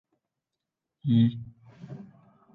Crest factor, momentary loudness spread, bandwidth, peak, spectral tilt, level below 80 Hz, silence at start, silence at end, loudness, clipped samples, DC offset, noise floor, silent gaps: 18 dB; 22 LU; 4.1 kHz; -12 dBFS; -10.5 dB/octave; -66 dBFS; 1.05 s; 0.55 s; -26 LUFS; under 0.1%; under 0.1%; -87 dBFS; none